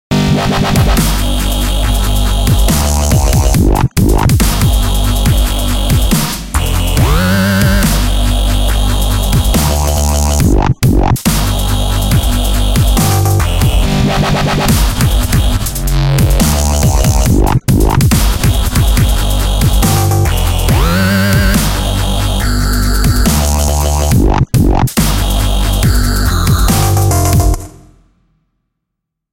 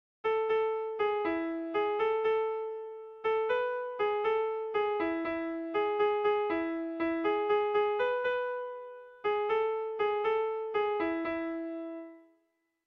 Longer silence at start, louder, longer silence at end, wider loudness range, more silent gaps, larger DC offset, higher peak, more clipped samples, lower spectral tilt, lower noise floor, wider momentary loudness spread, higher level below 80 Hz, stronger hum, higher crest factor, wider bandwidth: second, 0.1 s vs 0.25 s; first, -12 LUFS vs -31 LUFS; first, 1.6 s vs 0.65 s; about the same, 1 LU vs 2 LU; neither; neither; first, 0 dBFS vs -18 dBFS; neither; about the same, -5 dB/octave vs -6 dB/octave; about the same, -75 dBFS vs -77 dBFS; second, 3 LU vs 9 LU; first, -14 dBFS vs -68 dBFS; neither; about the same, 10 dB vs 12 dB; first, 17 kHz vs 5.2 kHz